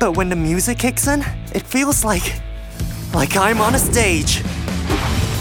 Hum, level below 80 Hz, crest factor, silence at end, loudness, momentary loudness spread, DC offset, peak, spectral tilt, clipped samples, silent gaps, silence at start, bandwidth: none; -28 dBFS; 16 dB; 0 s; -18 LUFS; 11 LU; under 0.1%; -2 dBFS; -4 dB/octave; under 0.1%; none; 0 s; 19 kHz